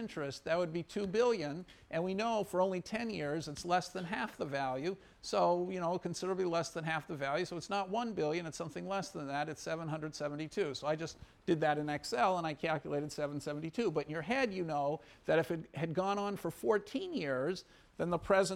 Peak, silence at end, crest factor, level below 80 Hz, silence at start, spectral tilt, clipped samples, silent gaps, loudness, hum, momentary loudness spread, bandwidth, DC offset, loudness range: -18 dBFS; 0 s; 18 dB; -66 dBFS; 0 s; -5 dB/octave; under 0.1%; none; -36 LUFS; none; 8 LU; 16.5 kHz; under 0.1%; 3 LU